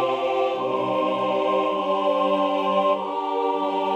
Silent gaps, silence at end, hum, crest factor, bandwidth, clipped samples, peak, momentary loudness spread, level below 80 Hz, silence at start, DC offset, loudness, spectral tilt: none; 0 s; none; 12 dB; 8.8 kHz; under 0.1%; -10 dBFS; 3 LU; -70 dBFS; 0 s; under 0.1%; -23 LUFS; -6 dB/octave